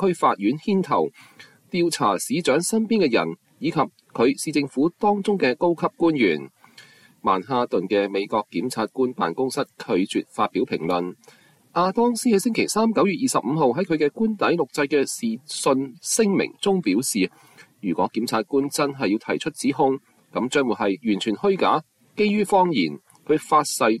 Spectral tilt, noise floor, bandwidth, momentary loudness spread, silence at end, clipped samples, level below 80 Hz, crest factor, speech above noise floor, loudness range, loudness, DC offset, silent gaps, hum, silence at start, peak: -4.5 dB/octave; -50 dBFS; 14.5 kHz; 7 LU; 0 s; under 0.1%; -64 dBFS; 16 dB; 29 dB; 3 LU; -22 LUFS; under 0.1%; none; none; 0 s; -8 dBFS